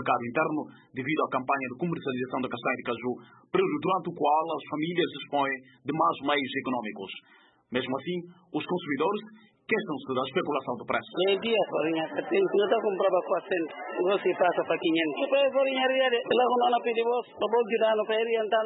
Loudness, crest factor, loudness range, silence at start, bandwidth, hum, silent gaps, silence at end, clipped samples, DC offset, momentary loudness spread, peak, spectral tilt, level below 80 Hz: -28 LUFS; 18 dB; 6 LU; 0 s; 4.1 kHz; none; none; 0 s; under 0.1%; under 0.1%; 9 LU; -10 dBFS; -9.5 dB/octave; -76 dBFS